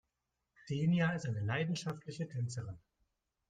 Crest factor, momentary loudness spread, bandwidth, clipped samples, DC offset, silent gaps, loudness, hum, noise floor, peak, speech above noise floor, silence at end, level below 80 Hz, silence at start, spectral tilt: 16 dB; 12 LU; 9.4 kHz; under 0.1%; under 0.1%; none; -37 LUFS; none; -87 dBFS; -22 dBFS; 51 dB; 0.7 s; -70 dBFS; 0.65 s; -6.5 dB/octave